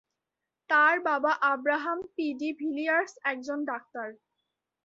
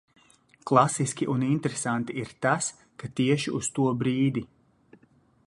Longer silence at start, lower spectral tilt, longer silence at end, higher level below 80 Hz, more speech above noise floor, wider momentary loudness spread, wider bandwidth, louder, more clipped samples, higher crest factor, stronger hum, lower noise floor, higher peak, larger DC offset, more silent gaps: about the same, 0.7 s vs 0.65 s; second, -3 dB/octave vs -5 dB/octave; second, 0.7 s vs 1 s; second, -80 dBFS vs -64 dBFS; first, 59 dB vs 36 dB; about the same, 13 LU vs 12 LU; second, 7.8 kHz vs 11.5 kHz; about the same, -28 LUFS vs -26 LUFS; neither; about the same, 18 dB vs 22 dB; neither; first, -87 dBFS vs -62 dBFS; second, -12 dBFS vs -6 dBFS; neither; neither